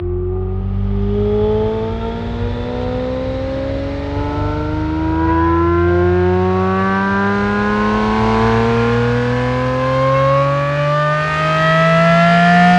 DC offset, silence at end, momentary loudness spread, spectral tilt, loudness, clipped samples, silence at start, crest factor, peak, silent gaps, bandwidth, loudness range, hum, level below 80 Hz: under 0.1%; 0 s; 10 LU; -7.5 dB/octave; -15 LUFS; under 0.1%; 0 s; 14 dB; 0 dBFS; none; 9.4 kHz; 6 LU; none; -28 dBFS